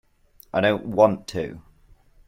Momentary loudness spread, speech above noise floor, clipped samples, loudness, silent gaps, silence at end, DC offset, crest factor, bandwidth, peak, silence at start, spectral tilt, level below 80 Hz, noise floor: 12 LU; 33 dB; under 0.1%; -22 LUFS; none; 0.7 s; under 0.1%; 22 dB; 16.5 kHz; -2 dBFS; 0.55 s; -6 dB/octave; -54 dBFS; -55 dBFS